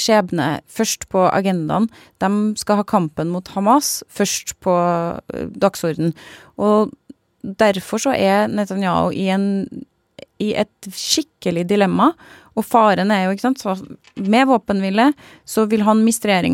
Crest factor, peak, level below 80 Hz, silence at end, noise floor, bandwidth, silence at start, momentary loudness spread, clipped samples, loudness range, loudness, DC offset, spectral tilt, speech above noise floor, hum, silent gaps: 16 dB; -2 dBFS; -56 dBFS; 0 s; -44 dBFS; 16.5 kHz; 0 s; 11 LU; under 0.1%; 3 LU; -18 LUFS; under 0.1%; -5 dB/octave; 26 dB; none; none